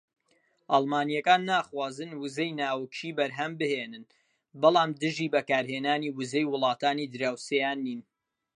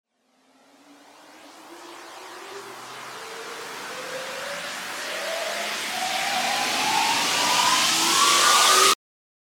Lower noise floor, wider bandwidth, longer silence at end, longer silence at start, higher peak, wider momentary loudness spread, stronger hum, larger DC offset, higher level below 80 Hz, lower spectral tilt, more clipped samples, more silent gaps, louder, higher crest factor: first, -70 dBFS vs -64 dBFS; second, 11 kHz vs over 20 kHz; about the same, 0.6 s vs 0.55 s; second, 0.7 s vs 1.3 s; second, -8 dBFS vs -4 dBFS; second, 11 LU vs 22 LU; neither; neither; second, -82 dBFS vs -70 dBFS; first, -4.5 dB/octave vs 0.5 dB/octave; neither; neither; second, -28 LUFS vs -20 LUFS; about the same, 22 dB vs 20 dB